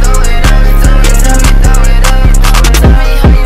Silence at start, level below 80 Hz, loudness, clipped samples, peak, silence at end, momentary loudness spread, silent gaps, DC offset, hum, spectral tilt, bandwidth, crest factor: 0 s; -4 dBFS; -8 LUFS; 1%; 0 dBFS; 0 s; 3 LU; none; 2%; none; -4.5 dB/octave; 15.5 kHz; 4 dB